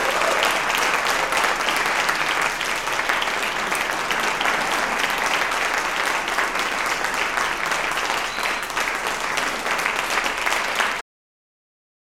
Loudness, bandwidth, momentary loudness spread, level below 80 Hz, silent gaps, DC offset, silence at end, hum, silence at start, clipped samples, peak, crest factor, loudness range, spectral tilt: -21 LUFS; 17 kHz; 3 LU; -48 dBFS; none; under 0.1%; 1.1 s; none; 0 s; under 0.1%; -4 dBFS; 18 dB; 2 LU; -0.5 dB/octave